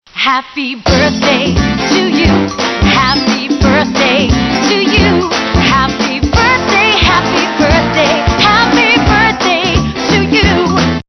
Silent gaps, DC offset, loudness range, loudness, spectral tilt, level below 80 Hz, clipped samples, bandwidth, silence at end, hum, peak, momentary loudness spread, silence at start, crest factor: none; under 0.1%; 2 LU; -10 LUFS; -4.5 dB/octave; -22 dBFS; under 0.1%; 11 kHz; 0.05 s; none; 0 dBFS; 5 LU; 0.15 s; 10 dB